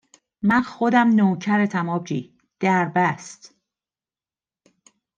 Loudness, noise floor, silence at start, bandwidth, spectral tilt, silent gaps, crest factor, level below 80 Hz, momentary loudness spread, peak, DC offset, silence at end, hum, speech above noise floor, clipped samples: -21 LUFS; under -90 dBFS; 0.45 s; 9 kHz; -6.5 dB/octave; none; 18 dB; -64 dBFS; 13 LU; -4 dBFS; under 0.1%; 1.85 s; none; over 70 dB; under 0.1%